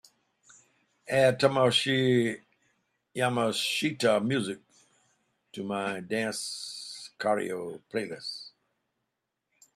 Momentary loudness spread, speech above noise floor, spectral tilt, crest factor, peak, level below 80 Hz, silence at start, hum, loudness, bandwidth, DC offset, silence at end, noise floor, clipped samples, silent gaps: 17 LU; 56 dB; -4.5 dB/octave; 24 dB; -6 dBFS; -72 dBFS; 1.05 s; none; -28 LUFS; 14.5 kHz; under 0.1%; 1.3 s; -83 dBFS; under 0.1%; none